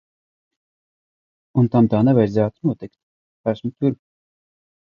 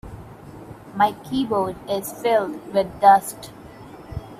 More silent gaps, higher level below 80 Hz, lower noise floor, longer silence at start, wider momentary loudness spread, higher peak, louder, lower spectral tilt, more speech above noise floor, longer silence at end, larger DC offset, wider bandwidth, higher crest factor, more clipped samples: first, 3.03-3.44 s vs none; second, -56 dBFS vs -48 dBFS; first, under -90 dBFS vs -41 dBFS; first, 1.55 s vs 0.05 s; second, 14 LU vs 26 LU; about the same, -2 dBFS vs -2 dBFS; about the same, -19 LUFS vs -21 LUFS; first, -10.5 dB/octave vs -5 dB/octave; first, over 72 dB vs 21 dB; first, 0.85 s vs 0 s; neither; second, 6.8 kHz vs 16 kHz; about the same, 18 dB vs 22 dB; neither